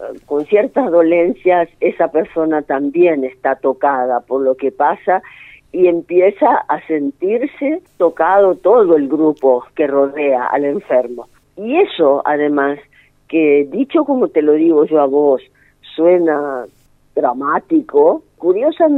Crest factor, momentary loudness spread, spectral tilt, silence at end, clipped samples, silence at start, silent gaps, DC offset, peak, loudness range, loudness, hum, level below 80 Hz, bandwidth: 14 dB; 7 LU; -8 dB/octave; 0 s; under 0.1%; 0 s; none; under 0.1%; 0 dBFS; 2 LU; -14 LUFS; 50 Hz at -60 dBFS; -58 dBFS; 4.1 kHz